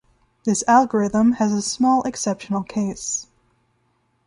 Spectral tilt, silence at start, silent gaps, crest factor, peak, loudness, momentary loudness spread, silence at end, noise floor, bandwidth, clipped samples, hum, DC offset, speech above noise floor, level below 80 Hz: -4.5 dB/octave; 0.45 s; none; 18 dB; -4 dBFS; -20 LUFS; 10 LU; 1.05 s; -66 dBFS; 11.5 kHz; under 0.1%; none; under 0.1%; 47 dB; -56 dBFS